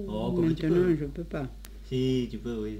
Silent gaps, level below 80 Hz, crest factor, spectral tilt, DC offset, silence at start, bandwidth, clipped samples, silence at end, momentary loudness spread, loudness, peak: none; -44 dBFS; 14 dB; -8 dB/octave; under 0.1%; 0 s; 16 kHz; under 0.1%; 0 s; 11 LU; -29 LUFS; -14 dBFS